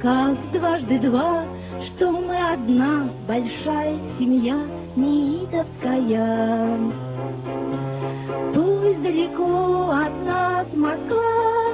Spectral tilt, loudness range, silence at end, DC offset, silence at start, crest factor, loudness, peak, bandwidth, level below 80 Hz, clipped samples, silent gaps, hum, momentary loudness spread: -11 dB/octave; 2 LU; 0 s; under 0.1%; 0 s; 16 dB; -22 LUFS; -6 dBFS; 4 kHz; -48 dBFS; under 0.1%; none; none; 8 LU